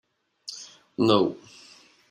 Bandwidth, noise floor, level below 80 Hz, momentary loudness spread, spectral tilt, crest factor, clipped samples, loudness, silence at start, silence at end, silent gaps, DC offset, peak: 15 kHz; -54 dBFS; -70 dBFS; 21 LU; -5.5 dB/octave; 22 dB; under 0.1%; -23 LUFS; 0.5 s; 0.75 s; none; under 0.1%; -6 dBFS